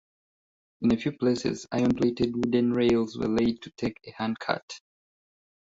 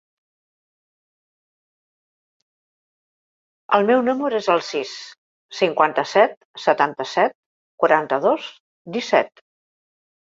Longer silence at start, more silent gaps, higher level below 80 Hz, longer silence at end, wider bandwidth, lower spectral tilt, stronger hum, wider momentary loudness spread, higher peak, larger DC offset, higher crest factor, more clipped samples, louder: second, 0.8 s vs 3.7 s; second, 4.62-4.68 s vs 5.18-5.49 s, 6.37-6.54 s, 7.35-7.78 s, 8.60-8.85 s; first, -56 dBFS vs -72 dBFS; about the same, 0.9 s vs 1 s; about the same, 7.8 kHz vs 7.8 kHz; first, -6.5 dB/octave vs -4.5 dB/octave; neither; second, 10 LU vs 14 LU; second, -8 dBFS vs -2 dBFS; neither; about the same, 20 dB vs 22 dB; neither; second, -27 LUFS vs -20 LUFS